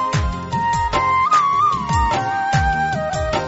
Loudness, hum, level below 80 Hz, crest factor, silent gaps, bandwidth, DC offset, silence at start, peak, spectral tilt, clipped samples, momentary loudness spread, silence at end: -18 LUFS; none; -30 dBFS; 14 dB; none; 8.2 kHz; under 0.1%; 0 s; -4 dBFS; -5 dB/octave; under 0.1%; 7 LU; 0 s